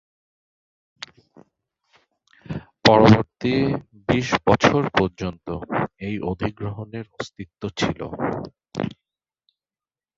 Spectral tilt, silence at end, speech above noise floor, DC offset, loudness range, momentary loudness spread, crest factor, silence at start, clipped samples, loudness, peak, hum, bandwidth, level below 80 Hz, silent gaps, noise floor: -6 dB/octave; 1.3 s; over 69 dB; under 0.1%; 10 LU; 19 LU; 22 dB; 2.5 s; under 0.1%; -21 LUFS; 0 dBFS; none; 7.8 kHz; -48 dBFS; none; under -90 dBFS